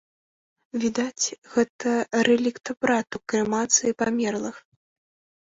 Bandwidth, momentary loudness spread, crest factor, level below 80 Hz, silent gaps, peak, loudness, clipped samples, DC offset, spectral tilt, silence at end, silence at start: 8 kHz; 8 LU; 20 dB; -64 dBFS; 1.38-1.42 s, 1.69-1.79 s; -6 dBFS; -24 LUFS; under 0.1%; under 0.1%; -3 dB/octave; 0.85 s; 0.75 s